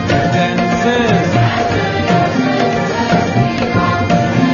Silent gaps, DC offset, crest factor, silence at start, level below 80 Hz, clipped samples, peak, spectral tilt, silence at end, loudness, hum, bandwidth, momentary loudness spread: none; under 0.1%; 12 dB; 0 s; -38 dBFS; under 0.1%; 0 dBFS; -6.5 dB/octave; 0 s; -14 LUFS; none; 7.2 kHz; 2 LU